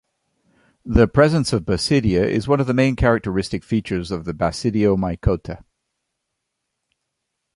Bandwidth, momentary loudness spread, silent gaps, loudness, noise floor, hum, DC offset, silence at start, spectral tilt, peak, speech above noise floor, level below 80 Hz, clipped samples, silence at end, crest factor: 11.5 kHz; 9 LU; none; -19 LUFS; -78 dBFS; none; under 0.1%; 0.85 s; -6.5 dB/octave; 0 dBFS; 59 dB; -34 dBFS; under 0.1%; 2 s; 20 dB